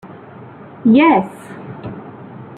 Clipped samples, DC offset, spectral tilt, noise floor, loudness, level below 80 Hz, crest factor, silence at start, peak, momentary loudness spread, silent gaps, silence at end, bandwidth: under 0.1%; under 0.1%; -7.5 dB/octave; -37 dBFS; -13 LUFS; -58 dBFS; 16 dB; 0.05 s; -2 dBFS; 26 LU; none; 0.15 s; 9.8 kHz